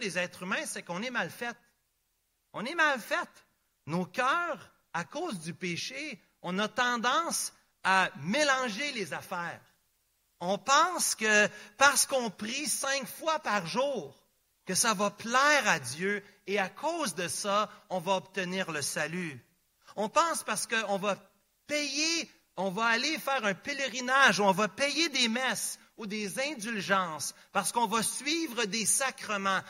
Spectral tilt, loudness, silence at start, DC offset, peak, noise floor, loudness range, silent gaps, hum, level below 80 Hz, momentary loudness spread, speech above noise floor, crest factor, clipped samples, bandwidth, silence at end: -2 dB/octave; -29 LUFS; 0 s; under 0.1%; -8 dBFS; -77 dBFS; 6 LU; none; none; -78 dBFS; 12 LU; 46 dB; 24 dB; under 0.1%; 16 kHz; 0 s